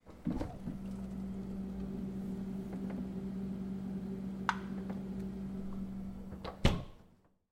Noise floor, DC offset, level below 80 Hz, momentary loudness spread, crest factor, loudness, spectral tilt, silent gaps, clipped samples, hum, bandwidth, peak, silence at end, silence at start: -65 dBFS; under 0.1%; -48 dBFS; 7 LU; 28 dB; -40 LUFS; -6.5 dB/octave; none; under 0.1%; none; 13.5 kHz; -12 dBFS; 0.35 s; 0.05 s